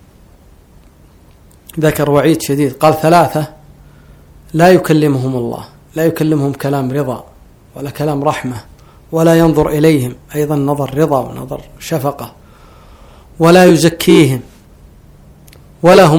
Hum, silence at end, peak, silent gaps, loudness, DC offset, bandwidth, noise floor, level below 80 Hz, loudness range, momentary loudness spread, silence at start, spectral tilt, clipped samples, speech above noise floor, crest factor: none; 0 s; 0 dBFS; none; -12 LUFS; under 0.1%; 20 kHz; -43 dBFS; -40 dBFS; 5 LU; 18 LU; 1.75 s; -6 dB/octave; 0.8%; 32 dB; 14 dB